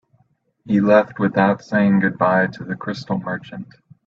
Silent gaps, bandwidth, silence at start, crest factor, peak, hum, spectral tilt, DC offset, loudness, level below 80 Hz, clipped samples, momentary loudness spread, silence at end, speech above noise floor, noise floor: none; 6.8 kHz; 0.65 s; 18 dB; -2 dBFS; none; -8.5 dB/octave; under 0.1%; -19 LUFS; -58 dBFS; under 0.1%; 13 LU; 0.45 s; 44 dB; -63 dBFS